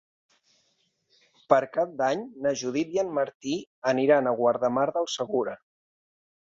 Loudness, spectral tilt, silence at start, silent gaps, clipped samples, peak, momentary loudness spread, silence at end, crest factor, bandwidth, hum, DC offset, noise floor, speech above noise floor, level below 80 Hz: -26 LUFS; -4.5 dB/octave; 1.5 s; 3.35-3.40 s, 3.67-3.82 s; under 0.1%; -6 dBFS; 8 LU; 0.95 s; 22 dB; 7.8 kHz; none; under 0.1%; -71 dBFS; 46 dB; -72 dBFS